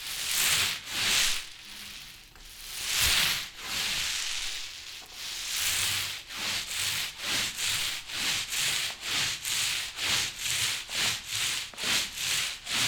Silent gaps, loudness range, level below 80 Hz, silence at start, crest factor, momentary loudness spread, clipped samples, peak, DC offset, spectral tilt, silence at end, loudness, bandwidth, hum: none; 2 LU; -54 dBFS; 0 s; 24 dB; 15 LU; under 0.1%; -8 dBFS; under 0.1%; 1 dB/octave; 0 s; -28 LUFS; over 20 kHz; none